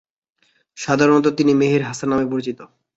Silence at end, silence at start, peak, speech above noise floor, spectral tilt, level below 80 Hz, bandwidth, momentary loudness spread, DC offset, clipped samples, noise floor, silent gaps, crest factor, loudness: 0.3 s; 0.75 s; -2 dBFS; 46 dB; -6 dB/octave; -56 dBFS; 8 kHz; 15 LU; under 0.1%; under 0.1%; -64 dBFS; none; 18 dB; -18 LUFS